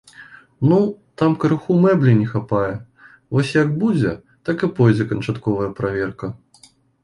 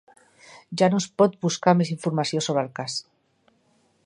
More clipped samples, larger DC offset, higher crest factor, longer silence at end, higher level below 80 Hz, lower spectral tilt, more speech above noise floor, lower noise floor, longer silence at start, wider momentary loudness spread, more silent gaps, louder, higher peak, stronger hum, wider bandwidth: neither; neither; second, 18 dB vs 24 dB; second, 0.7 s vs 1.05 s; first, -50 dBFS vs -70 dBFS; first, -8.5 dB/octave vs -5.5 dB/octave; second, 35 dB vs 42 dB; second, -52 dBFS vs -65 dBFS; second, 0.2 s vs 0.5 s; about the same, 10 LU vs 10 LU; neither; first, -19 LUFS vs -23 LUFS; about the same, -2 dBFS vs -2 dBFS; neither; about the same, 11 kHz vs 11 kHz